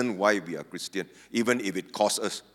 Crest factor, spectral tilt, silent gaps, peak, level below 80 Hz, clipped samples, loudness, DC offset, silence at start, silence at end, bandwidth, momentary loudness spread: 22 dB; -3.5 dB/octave; none; -8 dBFS; -74 dBFS; under 0.1%; -28 LUFS; under 0.1%; 0 s; 0.15 s; 17 kHz; 10 LU